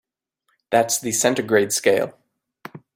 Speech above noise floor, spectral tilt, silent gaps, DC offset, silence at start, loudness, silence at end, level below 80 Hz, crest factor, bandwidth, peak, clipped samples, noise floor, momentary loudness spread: 53 dB; -3 dB/octave; none; under 0.1%; 0.7 s; -20 LUFS; 0.2 s; -66 dBFS; 20 dB; 16.5 kHz; -2 dBFS; under 0.1%; -72 dBFS; 14 LU